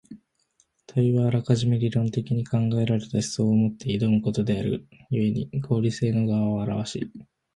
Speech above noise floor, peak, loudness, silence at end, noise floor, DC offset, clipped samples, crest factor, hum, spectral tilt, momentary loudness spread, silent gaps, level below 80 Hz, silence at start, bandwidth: 44 dB; -8 dBFS; -25 LUFS; 0.3 s; -68 dBFS; under 0.1%; under 0.1%; 18 dB; none; -7.5 dB/octave; 7 LU; none; -54 dBFS; 0.1 s; 11.5 kHz